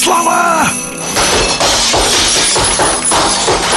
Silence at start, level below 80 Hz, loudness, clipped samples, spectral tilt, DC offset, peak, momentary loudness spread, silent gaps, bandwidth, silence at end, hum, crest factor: 0 s; -30 dBFS; -10 LUFS; under 0.1%; -1.5 dB/octave; under 0.1%; -2 dBFS; 4 LU; none; 12.5 kHz; 0 s; none; 10 dB